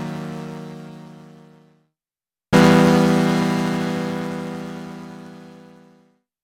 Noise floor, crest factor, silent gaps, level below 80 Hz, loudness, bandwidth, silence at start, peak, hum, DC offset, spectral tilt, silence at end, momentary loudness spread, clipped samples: under -90 dBFS; 20 dB; none; -54 dBFS; -18 LUFS; 16.5 kHz; 0 s; -2 dBFS; none; under 0.1%; -6.5 dB/octave; 0.95 s; 24 LU; under 0.1%